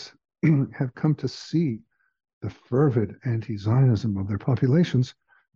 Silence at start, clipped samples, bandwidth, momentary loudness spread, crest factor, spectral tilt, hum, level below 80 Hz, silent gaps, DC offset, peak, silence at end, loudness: 0 s; under 0.1%; 7.2 kHz; 12 LU; 16 dB; -8.5 dB/octave; none; -58 dBFS; 2.33-2.41 s; under 0.1%; -8 dBFS; 0.45 s; -24 LUFS